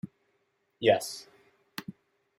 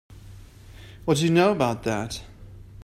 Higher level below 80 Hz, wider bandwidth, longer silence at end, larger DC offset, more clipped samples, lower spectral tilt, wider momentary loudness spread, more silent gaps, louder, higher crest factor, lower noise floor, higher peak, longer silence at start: second, -76 dBFS vs -48 dBFS; about the same, 16 kHz vs 15 kHz; first, 0.45 s vs 0 s; neither; neither; second, -4 dB/octave vs -5.5 dB/octave; first, 20 LU vs 14 LU; neither; second, -28 LUFS vs -23 LUFS; first, 24 dB vs 18 dB; first, -75 dBFS vs -45 dBFS; about the same, -10 dBFS vs -8 dBFS; about the same, 0.05 s vs 0.15 s